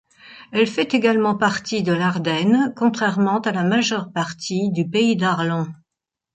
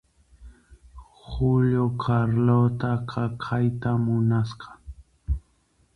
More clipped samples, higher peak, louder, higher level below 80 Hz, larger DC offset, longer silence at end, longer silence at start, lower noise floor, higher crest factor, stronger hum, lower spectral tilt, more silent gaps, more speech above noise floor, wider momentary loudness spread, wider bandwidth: neither; first, -4 dBFS vs -10 dBFS; first, -20 LUFS vs -24 LUFS; second, -64 dBFS vs -40 dBFS; neither; about the same, 0.6 s vs 0.55 s; second, 0.25 s vs 0.4 s; first, -84 dBFS vs -65 dBFS; about the same, 16 dB vs 16 dB; neither; second, -5.5 dB/octave vs -9.5 dB/octave; neither; first, 65 dB vs 42 dB; second, 7 LU vs 17 LU; first, 9 kHz vs 6 kHz